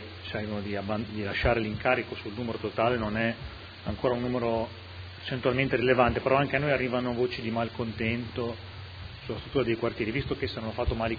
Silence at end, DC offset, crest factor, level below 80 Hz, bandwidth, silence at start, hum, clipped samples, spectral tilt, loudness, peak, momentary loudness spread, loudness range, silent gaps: 0 s; under 0.1%; 22 dB; -46 dBFS; 5 kHz; 0 s; none; under 0.1%; -8 dB/octave; -29 LUFS; -8 dBFS; 13 LU; 5 LU; none